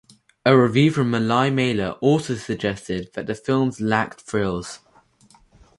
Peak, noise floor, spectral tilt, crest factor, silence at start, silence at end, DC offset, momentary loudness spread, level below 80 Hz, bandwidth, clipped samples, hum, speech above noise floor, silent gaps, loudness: -2 dBFS; -55 dBFS; -6.5 dB/octave; 20 dB; 0.45 s; 1 s; under 0.1%; 12 LU; -52 dBFS; 11.5 kHz; under 0.1%; none; 35 dB; none; -21 LUFS